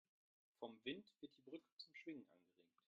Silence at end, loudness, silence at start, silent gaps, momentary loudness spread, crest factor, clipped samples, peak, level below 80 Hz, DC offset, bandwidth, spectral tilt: 0.25 s; -56 LUFS; 0.6 s; 1.72-1.77 s; 9 LU; 24 dB; under 0.1%; -36 dBFS; under -90 dBFS; under 0.1%; 7.2 kHz; -2.5 dB/octave